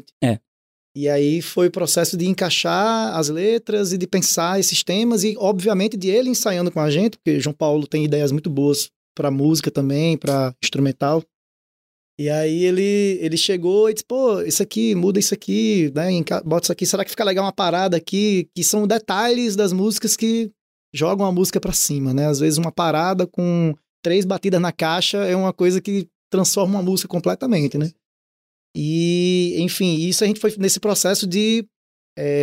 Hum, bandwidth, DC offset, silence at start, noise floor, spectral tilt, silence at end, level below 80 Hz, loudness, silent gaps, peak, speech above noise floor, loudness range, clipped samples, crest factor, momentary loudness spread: none; 16 kHz; under 0.1%; 0.2 s; under -90 dBFS; -4.5 dB/octave; 0 s; -54 dBFS; -19 LUFS; 0.47-0.95 s, 8.96-9.15 s, 11.34-12.18 s, 20.61-20.92 s, 23.89-24.03 s, 26.15-26.30 s, 28.06-28.74 s, 31.76-32.16 s; -6 dBFS; over 71 dB; 2 LU; under 0.1%; 12 dB; 5 LU